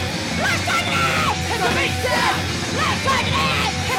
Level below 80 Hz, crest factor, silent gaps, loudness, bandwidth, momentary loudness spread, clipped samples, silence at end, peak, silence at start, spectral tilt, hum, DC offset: -40 dBFS; 12 dB; none; -19 LUFS; 16.5 kHz; 3 LU; under 0.1%; 0 s; -8 dBFS; 0 s; -3.5 dB/octave; none; under 0.1%